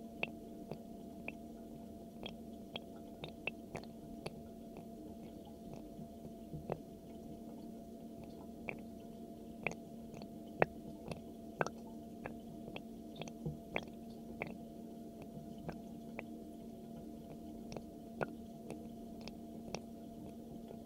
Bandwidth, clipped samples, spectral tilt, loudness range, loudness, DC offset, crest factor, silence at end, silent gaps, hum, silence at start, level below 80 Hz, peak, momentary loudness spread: 16.5 kHz; under 0.1%; -5.5 dB/octave; 6 LU; -48 LUFS; under 0.1%; 36 dB; 0 s; none; none; 0 s; -66 dBFS; -12 dBFS; 8 LU